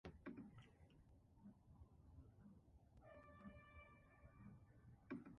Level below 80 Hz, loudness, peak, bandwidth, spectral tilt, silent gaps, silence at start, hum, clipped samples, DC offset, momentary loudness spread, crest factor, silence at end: -72 dBFS; -64 LUFS; -40 dBFS; 5.4 kHz; -7 dB/octave; none; 0.05 s; none; under 0.1%; under 0.1%; 10 LU; 22 dB; 0 s